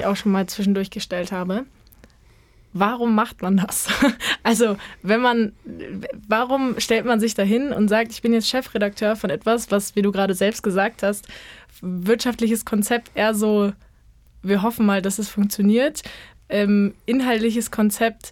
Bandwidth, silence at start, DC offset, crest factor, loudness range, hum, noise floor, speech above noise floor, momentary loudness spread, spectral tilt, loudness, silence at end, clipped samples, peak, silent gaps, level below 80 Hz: 17 kHz; 0 s; under 0.1%; 18 dB; 2 LU; none; -53 dBFS; 32 dB; 10 LU; -4.5 dB/octave; -21 LUFS; 0 s; under 0.1%; -4 dBFS; none; -52 dBFS